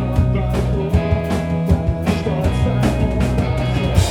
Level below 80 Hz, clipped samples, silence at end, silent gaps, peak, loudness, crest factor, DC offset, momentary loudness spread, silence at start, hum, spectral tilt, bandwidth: -24 dBFS; under 0.1%; 0 s; none; 0 dBFS; -18 LUFS; 16 dB; under 0.1%; 2 LU; 0 s; none; -7 dB/octave; 16.5 kHz